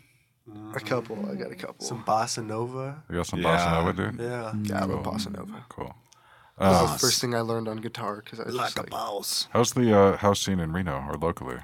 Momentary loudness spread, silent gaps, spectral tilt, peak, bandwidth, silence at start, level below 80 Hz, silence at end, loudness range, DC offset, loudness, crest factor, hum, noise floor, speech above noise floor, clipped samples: 15 LU; none; -4.5 dB/octave; -6 dBFS; 17.5 kHz; 0.45 s; -50 dBFS; 0 s; 4 LU; under 0.1%; -26 LUFS; 22 dB; none; -57 dBFS; 30 dB; under 0.1%